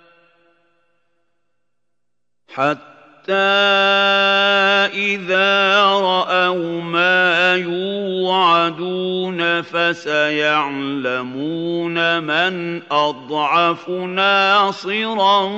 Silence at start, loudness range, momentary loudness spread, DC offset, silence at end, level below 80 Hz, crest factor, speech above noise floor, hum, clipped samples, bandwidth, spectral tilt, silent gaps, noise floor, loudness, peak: 2.5 s; 5 LU; 9 LU; under 0.1%; 0 s; -74 dBFS; 16 dB; 64 dB; 60 Hz at -50 dBFS; under 0.1%; 8 kHz; -4.5 dB/octave; none; -81 dBFS; -16 LUFS; -2 dBFS